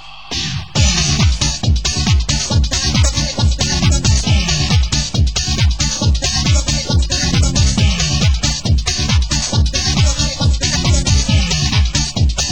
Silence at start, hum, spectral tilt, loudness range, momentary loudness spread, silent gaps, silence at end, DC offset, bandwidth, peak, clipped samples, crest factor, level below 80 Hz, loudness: 0 s; none; -3.5 dB/octave; 0 LU; 3 LU; none; 0 s; 2%; 16 kHz; 0 dBFS; under 0.1%; 14 dB; -18 dBFS; -15 LUFS